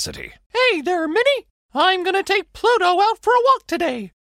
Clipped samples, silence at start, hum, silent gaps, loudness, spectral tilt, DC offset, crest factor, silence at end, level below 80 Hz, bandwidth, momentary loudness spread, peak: under 0.1%; 0 s; none; 0.46-0.50 s, 1.50-1.69 s; -18 LUFS; -2.5 dB/octave; under 0.1%; 14 dB; 0.15 s; -54 dBFS; 16 kHz; 9 LU; -4 dBFS